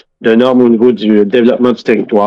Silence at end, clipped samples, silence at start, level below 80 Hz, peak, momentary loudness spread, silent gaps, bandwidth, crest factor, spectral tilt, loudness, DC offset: 0 s; 0.3%; 0.2 s; -54 dBFS; 0 dBFS; 4 LU; none; 6.6 kHz; 8 dB; -7.5 dB/octave; -9 LUFS; under 0.1%